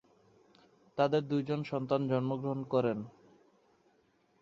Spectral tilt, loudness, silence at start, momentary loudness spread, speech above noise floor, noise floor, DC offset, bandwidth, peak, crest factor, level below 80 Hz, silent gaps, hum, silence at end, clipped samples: -8.5 dB/octave; -33 LUFS; 0.95 s; 9 LU; 39 dB; -71 dBFS; under 0.1%; 7.4 kHz; -14 dBFS; 20 dB; -74 dBFS; none; none; 1.3 s; under 0.1%